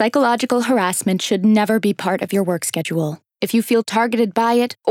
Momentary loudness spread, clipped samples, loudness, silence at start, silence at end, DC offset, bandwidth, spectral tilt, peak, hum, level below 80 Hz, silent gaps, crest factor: 6 LU; under 0.1%; -18 LUFS; 0 s; 0 s; under 0.1%; 17 kHz; -4.5 dB/octave; -2 dBFS; none; -72 dBFS; none; 16 dB